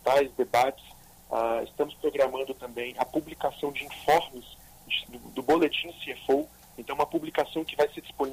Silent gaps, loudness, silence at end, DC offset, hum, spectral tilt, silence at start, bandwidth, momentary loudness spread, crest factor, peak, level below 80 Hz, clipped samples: none; -29 LUFS; 0 s; under 0.1%; none; -4 dB/octave; 0.05 s; 15.5 kHz; 11 LU; 16 dB; -12 dBFS; -58 dBFS; under 0.1%